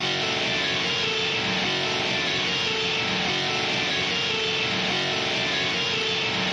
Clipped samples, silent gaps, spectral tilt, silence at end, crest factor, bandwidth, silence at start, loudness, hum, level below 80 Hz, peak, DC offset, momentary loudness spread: under 0.1%; none; -2.5 dB/octave; 0 s; 14 dB; 11 kHz; 0 s; -23 LUFS; none; -58 dBFS; -12 dBFS; under 0.1%; 1 LU